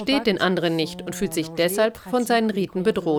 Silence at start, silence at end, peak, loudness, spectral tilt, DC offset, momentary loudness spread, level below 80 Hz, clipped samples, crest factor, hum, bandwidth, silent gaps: 0 s; 0 s; -8 dBFS; -23 LUFS; -4.5 dB/octave; under 0.1%; 5 LU; -54 dBFS; under 0.1%; 14 dB; none; over 20 kHz; none